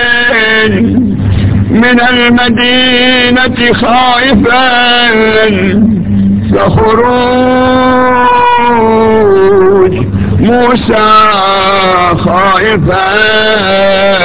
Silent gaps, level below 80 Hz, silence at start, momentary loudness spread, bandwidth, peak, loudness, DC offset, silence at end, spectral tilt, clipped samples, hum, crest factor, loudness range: none; -26 dBFS; 0 s; 4 LU; 4 kHz; 0 dBFS; -6 LUFS; 5%; 0 s; -9.5 dB/octave; 1%; none; 6 dB; 1 LU